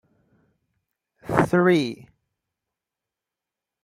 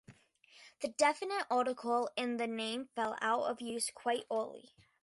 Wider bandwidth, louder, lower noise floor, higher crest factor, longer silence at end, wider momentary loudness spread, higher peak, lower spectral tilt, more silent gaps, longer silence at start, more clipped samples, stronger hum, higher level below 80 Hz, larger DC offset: first, 13.5 kHz vs 11.5 kHz; first, -21 LUFS vs -35 LUFS; first, -87 dBFS vs -64 dBFS; first, 26 dB vs 20 dB; first, 1.9 s vs 0.45 s; first, 23 LU vs 7 LU; first, -2 dBFS vs -16 dBFS; first, -7 dB/octave vs -2 dB/octave; neither; first, 1.25 s vs 0.1 s; neither; neither; first, -56 dBFS vs -82 dBFS; neither